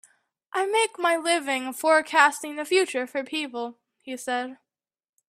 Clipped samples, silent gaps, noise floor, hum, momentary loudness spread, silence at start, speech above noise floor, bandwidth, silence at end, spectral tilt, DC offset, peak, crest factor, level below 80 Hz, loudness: under 0.1%; none; -58 dBFS; none; 15 LU; 0.55 s; 34 dB; 16 kHz; 0.75 s; -0.5 dB/octave; under 0.1%; -4 dBFS; 22 dB; -80 dBFS; -24 LUFS